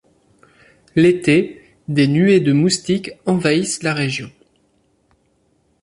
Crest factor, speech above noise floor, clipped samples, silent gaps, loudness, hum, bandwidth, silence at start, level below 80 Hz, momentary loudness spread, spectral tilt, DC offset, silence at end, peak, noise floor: 16 dB; 46 dB; under 0.1%; none; -17 LUFS; none; 11.5 kHz; 0.95 s; -56 dBFS; 11 LU; -5.5 dB/octave; under 0.1%; 1.55 s; -2 dBFS; -62 dBFS